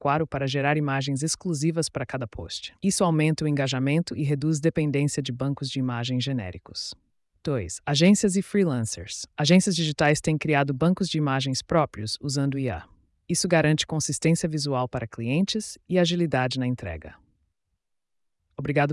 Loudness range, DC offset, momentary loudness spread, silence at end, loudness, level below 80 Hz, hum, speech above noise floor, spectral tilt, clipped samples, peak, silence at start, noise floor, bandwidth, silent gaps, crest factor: 5 LU; under 0.1%; 12 LU; 0 s; -25 LUFS; -54 dBFS; none; 52 dB; -5 dB/octave; under 0.1%; -8 dBFS; 0 s; -77 dBFS; 12 kHz; none; 16 dB